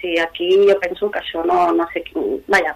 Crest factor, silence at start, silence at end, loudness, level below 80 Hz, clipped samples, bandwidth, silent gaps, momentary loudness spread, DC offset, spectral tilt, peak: 16 dB; 0 s; 0 s; -18 LUFS; -52 dBFS; under 0.1%; 14 kHz; none; 10 LU; under 0.1%; -4.5 dB/octave; -2 dBFS